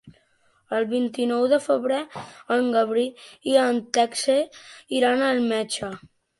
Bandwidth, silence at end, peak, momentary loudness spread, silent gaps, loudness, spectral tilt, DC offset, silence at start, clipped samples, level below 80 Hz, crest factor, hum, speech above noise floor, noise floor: 11.5 kHz; 0.4 s; -6 dBFS; 11 LU; none; -23 LUFS; -3.5 dB/octave; under 0.1%; 0.05 s; under 0.1%; -66 dBFS; 18 dB; none; 41 dB; -64 dBFS